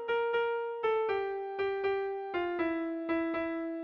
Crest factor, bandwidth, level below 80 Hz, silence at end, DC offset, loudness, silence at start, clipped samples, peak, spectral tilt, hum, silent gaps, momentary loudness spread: 12 dB; 5.6 kHz; -68 dBFS; 0 s; under 0.1%; -33 LUFS; 0 s; under 0.1%; -20 dBFS; -6.5 dB/octave; none; none; 4 LU